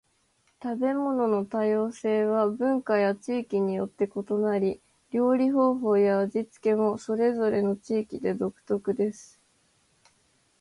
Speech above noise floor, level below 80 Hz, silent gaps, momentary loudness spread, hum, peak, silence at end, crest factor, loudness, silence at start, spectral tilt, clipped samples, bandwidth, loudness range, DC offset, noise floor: 43 dB; -68 dBFS; none; 8 LU; none; -12 dBFS; 1.35 s; 14 dB; -26 LUFS; 0.6 s; -7.5 dB/octave; under 0.1%; 11 kHz; 4 LU; under 0.1%; -69 dBFS